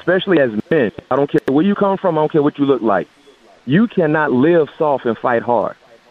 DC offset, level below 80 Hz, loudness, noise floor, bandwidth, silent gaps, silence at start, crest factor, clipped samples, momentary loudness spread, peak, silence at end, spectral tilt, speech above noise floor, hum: under 0.1%; -56 dBFS; -16 LUFS; -47 dBFS; 6.6 kHz; none; 0.05 s; 14 dB; under 0.1%; 5 LU; -2 dBFS; 0.4 s; -8.5 dB/octave; 32 dB; none